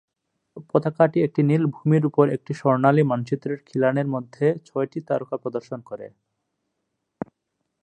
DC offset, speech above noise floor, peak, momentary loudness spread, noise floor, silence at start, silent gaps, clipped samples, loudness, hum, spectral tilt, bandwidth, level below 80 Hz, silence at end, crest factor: under 0.1%; 56 dB; -2 dBFS; 19 LU; -78 dBFS; 0.55 s; none; under 0.1%; -22 LUFS; none; -9.5 dB/octave; 8.8 kHz; -68 dBFS; 1.75 s; 20 dB